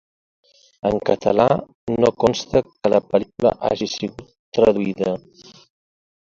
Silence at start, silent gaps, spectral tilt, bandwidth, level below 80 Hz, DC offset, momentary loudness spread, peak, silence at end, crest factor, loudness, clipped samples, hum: 0.85 s; 1.75-1.87 s, 4.39-4.52 s; -6 dB/octave; 7.6 kHz; -50 dBFS; under 0.1%; 9 LU; 0 dBFS; 1.1 s; 20 dB; -20 LUFS; under 0.1%; none